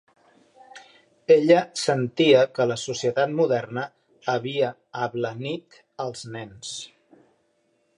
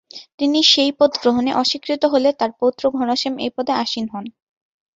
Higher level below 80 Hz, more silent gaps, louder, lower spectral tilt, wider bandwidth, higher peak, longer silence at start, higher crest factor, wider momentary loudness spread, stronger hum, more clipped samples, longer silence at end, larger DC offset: second, -70 dBFS vs -60 dBFS; second, none vs 0.34-0.38 s; second, -23 LUFS vs -18 LUFS; first, -5 dB/octave vs -3 dB/octave; first, 11 kHz vs 7.8 kHz; second, -4 dBFS vs 0 dBFS; first, 0.75 s vs 0.15 s; about the same, 20 dB vs 18 dB; first, 18 LU vs 12 LU; neither; neither; first, 1.1 s vs 0.65 s; neither